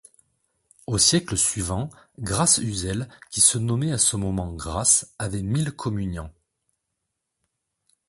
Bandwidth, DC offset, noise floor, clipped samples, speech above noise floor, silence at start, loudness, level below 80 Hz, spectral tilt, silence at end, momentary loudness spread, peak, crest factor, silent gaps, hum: 12 kHz; under 0.1%; -80 dBFS; under 0.1%; 57 dB; 0.9 s; -22 LUFS; -44 dBFS; -3 dB/octave; 1.8 s; 14 LU; -4 dBFS; 22 dB; none; none